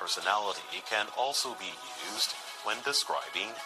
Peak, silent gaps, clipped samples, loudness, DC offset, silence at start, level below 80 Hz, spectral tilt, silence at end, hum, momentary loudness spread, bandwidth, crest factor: -10 dBFS; none; under 0.1%; -32 LUFS; under 0.1%; 0 s; -80 dBFS; 0.5 dB/octave; 0 s; none; 8 LU; 13 kHz; 22 dB